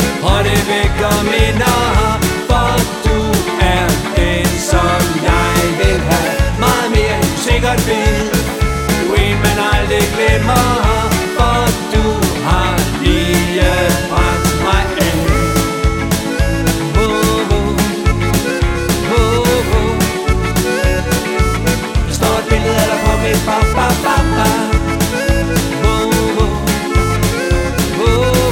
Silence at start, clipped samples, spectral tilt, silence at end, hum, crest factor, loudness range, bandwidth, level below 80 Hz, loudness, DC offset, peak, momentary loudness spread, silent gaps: 0 s; under 0.1%; -5 dB/octave; 0 s; none; 12 dB; 1 LU; 18 kHz; -20 dBFS; -14 LUFS; under 0.1%; 0 dBFS; 3 LU; none